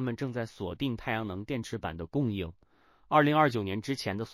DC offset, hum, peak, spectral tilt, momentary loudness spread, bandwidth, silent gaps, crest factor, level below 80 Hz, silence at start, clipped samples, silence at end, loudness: under 0.1%; none; -10 dBFS; -6.5 dB/octave; 12 LU; 15.5 kHz; none; 22 dB; -56 dBFS; 0 s; under 0.1%; 0 s; -31 LUFS